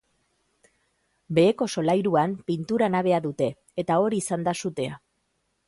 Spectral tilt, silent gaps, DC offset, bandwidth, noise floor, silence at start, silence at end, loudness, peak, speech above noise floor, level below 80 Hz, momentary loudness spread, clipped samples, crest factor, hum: -6 dB/octave; none; under 0.1%; 11.5 kHz; -74 dBFS; 1.3 s; 0.7 s; -25 LUFS; -8 dBFS; 50 dB; -64 dBFS; 9 LU; under 0.1%; 18 dB; none